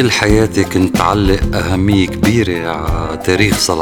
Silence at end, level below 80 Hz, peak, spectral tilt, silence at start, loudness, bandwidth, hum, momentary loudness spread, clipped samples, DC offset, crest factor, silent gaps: 0 s; -24 dBFS; 0 dBFS; -5 dB/octave; 0 s; -13 LUFS; 19 kHz; none; 7 LU; 0.1%; under 0.1%; 12 dB; none